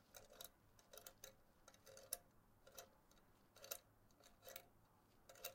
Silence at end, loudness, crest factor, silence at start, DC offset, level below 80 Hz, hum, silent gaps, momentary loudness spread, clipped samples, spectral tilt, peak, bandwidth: 0 s; -58 LUFS; 34 dB; 0 s; under 0.1%; -78 dBFS; none; none; 13 LU; under 0.1%; -1 dB/octave; -28 dBFS; 16.5 kHz